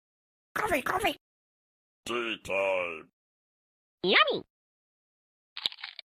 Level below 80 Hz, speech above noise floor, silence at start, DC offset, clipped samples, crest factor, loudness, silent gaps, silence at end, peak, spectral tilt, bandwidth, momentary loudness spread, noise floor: -62 dBFS; over 61 dB; 0.55 s; under 0.1%; under 0.1%; 24 dB; -29 LUFS; 1.21-2.03 s, 3.13-3.98 s, 4.50-5.56 s; 0.25 s; -8 dBFS; -3 dB/octave; 15.5 kHz; 20 LU; under -90 dBFS